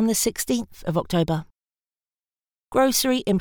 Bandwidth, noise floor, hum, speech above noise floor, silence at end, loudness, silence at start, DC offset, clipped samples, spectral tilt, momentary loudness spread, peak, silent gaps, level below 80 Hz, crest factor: over 20 kHz; under -90 dBFS; none; over 68 dB; 0 s; -23 LUFS; 0 s; under 0.1%; under 0.1%; -4.5 dB/octave; 8 LU; -6 dBFS; none; -50 dBFS; 18 dB